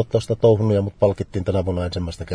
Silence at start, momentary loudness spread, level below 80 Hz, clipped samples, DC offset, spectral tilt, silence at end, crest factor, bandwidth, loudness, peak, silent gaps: 0 s; 9 LU; -42 dBFS; under 0.1%; under 0.1%; -8 dB/octave; 0 s; 16 dB; 10.5 kHz; -20 LUFS; -4 dBFS; none